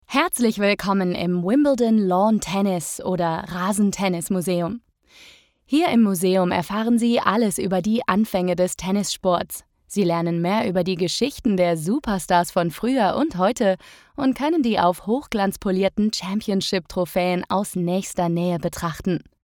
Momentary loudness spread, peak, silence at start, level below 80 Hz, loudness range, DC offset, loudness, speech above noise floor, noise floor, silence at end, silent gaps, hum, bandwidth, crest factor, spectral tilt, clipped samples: 6 LU; -4 dBFS; 0.1 s; -52 dBFS; 3 LU; under 0.1%; -21 LUFS; 30 dB; -50 dBFS; 0.25 s; none; none; 19 kHz; 18 dB; -5.5 dB/octave; under 0.1%